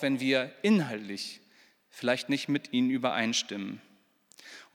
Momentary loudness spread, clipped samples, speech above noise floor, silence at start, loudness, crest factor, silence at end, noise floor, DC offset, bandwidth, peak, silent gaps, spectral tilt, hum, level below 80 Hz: 17 LU; under 0.1%; 34 dB; 0 s; -29 LUFS; 18 dB; 0.1 s; -63 dBFS; under 0.1%; 18 kHz; -12 dBFS; none; -4 dB/octave; none; -86 dBFS